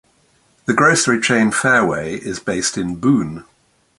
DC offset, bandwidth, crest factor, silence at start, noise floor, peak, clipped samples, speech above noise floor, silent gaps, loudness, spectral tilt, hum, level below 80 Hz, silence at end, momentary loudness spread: under 0.1%; 11.5 kHz; 18 dB; 0.7 s; -58 dBFS; 0 dBFS; under 0.1%; 41 dB; none; -16 LUFS; -4 dB/octave; none; -50 dBFS; 0.55 s; 12 LU